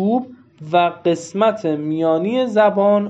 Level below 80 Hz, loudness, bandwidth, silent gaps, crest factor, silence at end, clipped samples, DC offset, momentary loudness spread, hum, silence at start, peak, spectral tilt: -70 dBFS; -18 LUFS; 8.2 kHz; none; 14 dB; 0 s; under 0.1%; under 0.1%; 7 LU; none; 0 s; -2 dBFS; -6.5 dB/octave